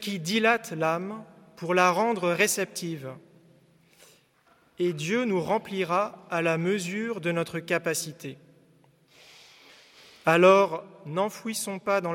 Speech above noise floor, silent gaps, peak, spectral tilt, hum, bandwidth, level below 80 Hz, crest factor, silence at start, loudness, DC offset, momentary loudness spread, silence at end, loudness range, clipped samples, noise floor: 37 dB; none; -6 dBFS; -4.5 dB/octave; none; 17 kHz; -74 dBFS; 20 dB; 0 s; -26 LUFS; under 0.1%; 14 LU; 0 s; 6 LU; under 0.1%; -63 dBFS